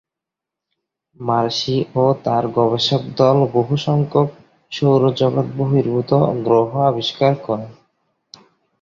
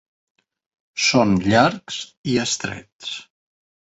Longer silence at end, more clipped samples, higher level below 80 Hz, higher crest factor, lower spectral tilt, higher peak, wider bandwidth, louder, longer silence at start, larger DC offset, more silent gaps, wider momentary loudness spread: first, 1.1 s vs 0.6 s; neither; about the same, -56 dBFS vs -52 dBFS; about the same, 16 dB vs 20 dB; first, -7 dB/octave vs -4 dB/octave; about the same, -2 dBFS vs -2 dBFS; second, 7.4 kHz vs 8.4 kHz; first, -17 LUFS vs -20 LUFS; first, 1.2 s vs 0.95 s; neither; second, none vs 2.17-2.24 s, 2.93-2.99 s; second, 7 LU vs 16 LU